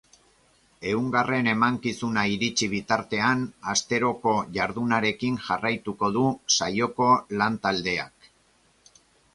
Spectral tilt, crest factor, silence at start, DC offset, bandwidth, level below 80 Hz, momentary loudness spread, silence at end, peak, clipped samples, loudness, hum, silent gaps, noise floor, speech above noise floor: -3.5 dB/octave; 20 dB; 0.8 s; under 0.1%; 11.5 kHz; -58 dBFS; 6 LU; 1.25 s; -6 dBFS; under 0.1%; -25 LUFS; none; none; -63 dBFS; 38 dB